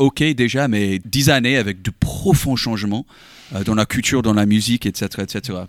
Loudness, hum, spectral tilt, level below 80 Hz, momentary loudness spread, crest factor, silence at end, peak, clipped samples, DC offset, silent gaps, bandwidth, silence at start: -18 LUFS; none; -5 dB/octave; -38 dBFS; 10 LU; 16 dB; 0 s; -2 dBFS; under 0.1%; under 0.1%; none; 17 kHz; 0 s